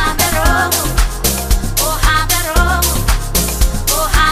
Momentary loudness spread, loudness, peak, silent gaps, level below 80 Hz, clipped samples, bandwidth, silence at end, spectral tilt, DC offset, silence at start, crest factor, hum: 4 LU; -14 LUFS; 0 dBFS; none; -16 dBFS; under 0.1%; 15.5 kHz; 0 s; -3 dB/octave; 0.8%; 0 s; 14 dB; none